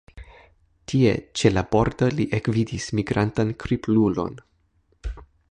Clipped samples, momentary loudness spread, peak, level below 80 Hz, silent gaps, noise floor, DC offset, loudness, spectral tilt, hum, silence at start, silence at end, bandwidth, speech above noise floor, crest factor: under 0.1%; 17 LU; -4 dBFS; -42 dBFS; none; -64 dBFS; under 0.1%; -23 LUFS; -6.5 dB/octave; none; 0.15 s; 0.25 s; 10.5 kHz; 43 dB; 20 dB